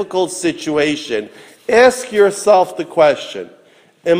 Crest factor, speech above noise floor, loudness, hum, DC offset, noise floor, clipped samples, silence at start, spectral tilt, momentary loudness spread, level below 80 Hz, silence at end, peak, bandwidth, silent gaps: 16 dB; 31 dB; -15 LUFS; none; under 0.1%; -46 dBFS; under 0.1%; 0 s; -3.5 dB/octave; 18 LU; -56 dBFS; 0 s; 0 dBFS; 16 kHz; none